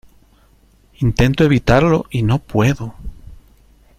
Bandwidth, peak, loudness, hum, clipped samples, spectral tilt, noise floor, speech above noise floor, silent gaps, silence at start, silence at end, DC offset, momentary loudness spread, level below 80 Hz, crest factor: 15 kHz; 0 dBFS; -16 LUFS; none; under 0.1%; -7 dB/octave; -52 dBFS; 37 dB; none; 1 s; 0.65 s; under 0.1%; 16 LU; -32 dBFS; 16 dB